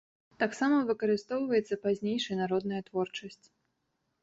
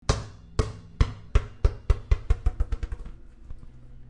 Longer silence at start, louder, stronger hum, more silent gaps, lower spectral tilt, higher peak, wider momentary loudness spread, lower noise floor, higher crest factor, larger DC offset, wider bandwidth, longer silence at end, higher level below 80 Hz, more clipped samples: first, 0.4 s vs 0.1 s; about the same, -31 LUFS vs -30 LUFS; neither; neither; about the same, -5.5 dB/octave vs -6 dB/octave; second, -16 dBFS vs -8 dBFS; second, 7 LU vs 21 LU; first, -80 dBFS vs -43 dBFS; about the same, 16 dB vs 20 dB; neither; second, 8 kHz vs 10 kHz; first, 0.9 s vs 0.05 s; second, -72 dBFS vs -28 dBFS; neither